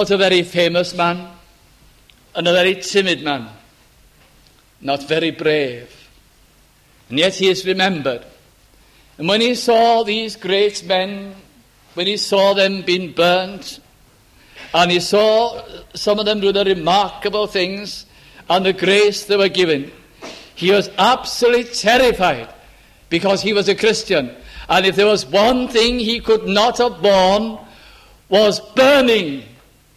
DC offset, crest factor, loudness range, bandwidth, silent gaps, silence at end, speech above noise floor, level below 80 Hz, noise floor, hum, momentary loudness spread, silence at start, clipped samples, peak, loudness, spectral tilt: under 0.1%; 16 dB; 5 LU; 15.5 kHz; none; 0.5 s; 36 dB; -48 dBFS; -52 dBFS; none; 14 LU; 0 s; under 0.1%; -2 dBFS; -16 LUFS; -4 dB/octave